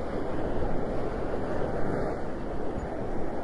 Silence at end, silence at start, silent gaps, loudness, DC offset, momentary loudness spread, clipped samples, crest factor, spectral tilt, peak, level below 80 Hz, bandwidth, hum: 0 s; 0 s; none; -33 LUFS; under 0.1%; 3 LU; under 0.1%; 14 dB; -8 dB/octave; -14 dBFS; -38 dBFS; 7.4 kHz; none